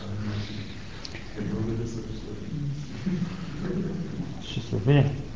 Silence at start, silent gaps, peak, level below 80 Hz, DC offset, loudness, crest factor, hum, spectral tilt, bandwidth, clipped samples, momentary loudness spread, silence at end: 0 s; none; -10 dBFS; -44 dBFS; 0.9%; -30 LUFS; 20 dB; none; -7.5 dB/octave; 7.6 kHz; under 0.1%; 15 LU; 0 s